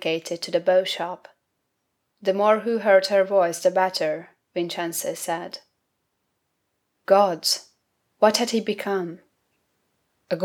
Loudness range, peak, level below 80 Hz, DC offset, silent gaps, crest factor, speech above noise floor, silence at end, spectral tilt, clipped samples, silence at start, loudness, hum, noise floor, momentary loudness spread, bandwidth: 5 LU; -4 dBFS; -80 dBFS; under 0.1%; none; 20 dB; 54 dB; 0 s; -3 dB/octave; under 0.1%; 0 s; -22 LUFS; none; -76 dBFS; 14 LU; 18.5 kHz